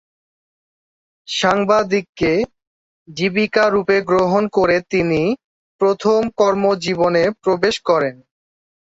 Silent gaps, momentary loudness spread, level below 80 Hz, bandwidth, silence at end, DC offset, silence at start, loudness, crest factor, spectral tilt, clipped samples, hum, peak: 2.09-2.13 s, 2.67-3.06 s, 5.44-5.79 s; 6 LU; -50 dBFS; 8 kHz; 0.7 s; under 0.1%; 1.3 s; -17 LUFS; 16 dB; -5.5 dB/octave; under 0.1%; none; -2 dBFS